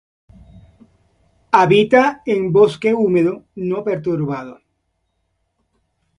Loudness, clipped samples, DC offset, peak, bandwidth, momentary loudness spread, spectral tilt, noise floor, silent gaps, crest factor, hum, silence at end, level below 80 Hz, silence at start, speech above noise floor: -16 LUFS; under 0.1%; under 0.1%; 0 dBFS; 11 kHz; 12 LU; -7 dB/octave; -70 dBFS; none; 18 dB; none; 1.65 s; -56 dBFS; 1.55 s; 54 dB